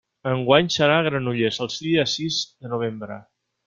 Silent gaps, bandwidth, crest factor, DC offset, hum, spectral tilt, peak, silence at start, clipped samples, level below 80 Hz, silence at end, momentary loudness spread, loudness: none; 7.6 kHz; 20 dB; under 0.1%; none; -4.5 dB/octave; -2 dBFS; 0.25 s; under 0.1%; -60 dBFS; 0.45 s; 11 LU; -22 LUFS